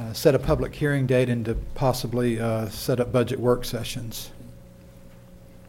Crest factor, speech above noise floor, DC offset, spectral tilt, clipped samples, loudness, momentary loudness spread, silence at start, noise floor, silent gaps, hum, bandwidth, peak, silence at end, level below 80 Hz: 20 dB; 23 dB; under 0.1%; -6 dB/octave; under 0.1%; -25 LUFS; 10 LU; 0 s; -46 dBFS; none; none; 16.5 kHz; -6 dBFS; 0 s; -40 dBFS